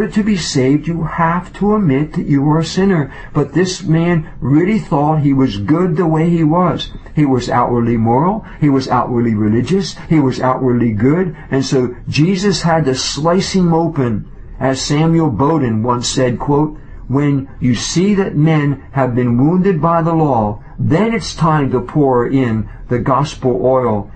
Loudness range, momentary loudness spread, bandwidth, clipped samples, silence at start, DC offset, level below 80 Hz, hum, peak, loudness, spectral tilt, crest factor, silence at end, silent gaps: 1 LU; 5 LU; 8.8 kHz; under 0.1%; 0 s; under 0.1%; -36 dBFS; none; -2 dBFS; -14 LUFS; -6.5 dB/octave; 12 dB; 0 s; none